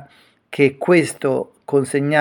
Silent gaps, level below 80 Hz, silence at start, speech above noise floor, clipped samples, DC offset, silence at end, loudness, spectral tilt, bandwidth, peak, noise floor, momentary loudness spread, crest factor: none; -68 dBFS; 0 s; 33 dB; under 0.1%; under 0.1%; 0 s; -18 LUFS; -6 dB/octave; 18 kHz; -2 dBFS; -50 dBFS; 7 LU; 18 dB